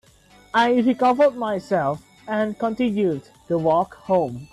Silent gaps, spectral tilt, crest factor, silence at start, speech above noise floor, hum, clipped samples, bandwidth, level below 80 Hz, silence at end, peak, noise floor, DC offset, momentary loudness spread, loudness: none; -7 dB/octave; 14 dB; 0.55 s; 32 dB; none; under 0.1%; 12 kHz; -58 dBFS; 0.1 s; -8 dBFS; -52 dBFS; under 0.1%; 9 LU; -21 LUFS